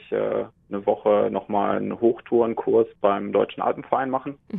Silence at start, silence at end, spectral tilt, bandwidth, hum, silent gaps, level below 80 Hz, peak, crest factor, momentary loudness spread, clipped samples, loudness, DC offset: 0.1 s; 0 s; -10 dB/octave; 3.9 kHz; none; none; -62 dBFS; -4 dBFS; 20 dB; 7 LU; under 0.1%; -23 LUFS; under 0.1%